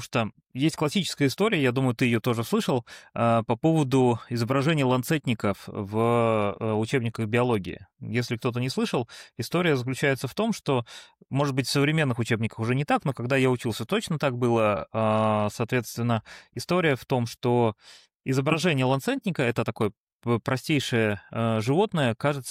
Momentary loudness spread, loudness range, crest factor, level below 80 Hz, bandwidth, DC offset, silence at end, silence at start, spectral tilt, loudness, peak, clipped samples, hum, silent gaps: 7 LU; 3 LU; 14 dB; -62 dBFS; 16 kHz; under 0.1%; 0 s; 0 s; -6 dB/octave; -25 LUFS; -10 dBFS; under 0.1%; none; 18.15-18.20 s, 19.97-20.07 s, 20.13-20.19 s